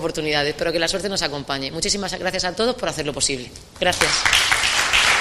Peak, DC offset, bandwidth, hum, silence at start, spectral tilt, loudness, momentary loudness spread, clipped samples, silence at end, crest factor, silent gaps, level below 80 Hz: -2 dBFS; under 0.1%; 15 kHz; none; 0 s; -1.5 dB/octave; -19 LUFS; 9 LU; under 0.1%; 0 s; 20 dB; none; -42 dBFS